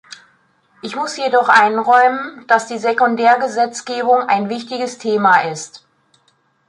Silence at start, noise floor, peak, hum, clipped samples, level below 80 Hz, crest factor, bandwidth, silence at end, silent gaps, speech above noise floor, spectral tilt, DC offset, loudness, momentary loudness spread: 0.85 s; -60 dBFS; 0 dBFS; none; under 0.1%; -70 dBFS; 16 dB; 11 kHz; 0.9 s; none; 45 dB; -3.5 dB/octave; under 0.1%; -15 LUFS; 13 LU